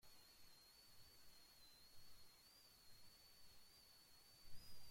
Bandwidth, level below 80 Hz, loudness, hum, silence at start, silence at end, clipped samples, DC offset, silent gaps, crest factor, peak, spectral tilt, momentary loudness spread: 16.5 kHz; -76 dBFS; -67 LUFS; none; 0 s; 0 s; under 0.1%; under 0.1%; none; 18 dB; -42 dBFS; -1.5 dB/octave; 2 LU